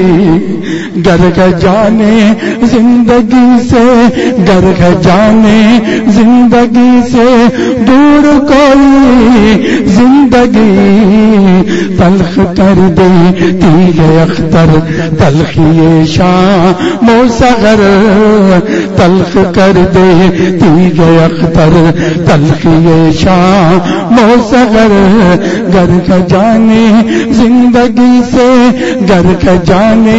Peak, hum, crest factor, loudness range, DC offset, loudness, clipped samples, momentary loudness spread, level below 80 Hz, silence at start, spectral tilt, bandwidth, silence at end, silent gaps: 0 dBFS; none; 4 dB; 2 LU; under 0.1%; -5 LUFS; 2%; 4 LU; -26 dBFS; 0 s; -7 dB/octave; 8 kHz; 0 s; none